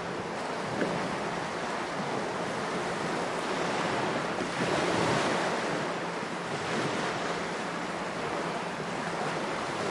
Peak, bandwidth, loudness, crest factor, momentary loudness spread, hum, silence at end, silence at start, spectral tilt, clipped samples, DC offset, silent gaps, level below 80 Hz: -14 dBFS; 11.5 kHz; -31 LUFS; 18 dB; 6 LU; none; 0 s; 0 s; -4.5 dB/octave; under 0.1%; under 0.1%; none; -64 dBFS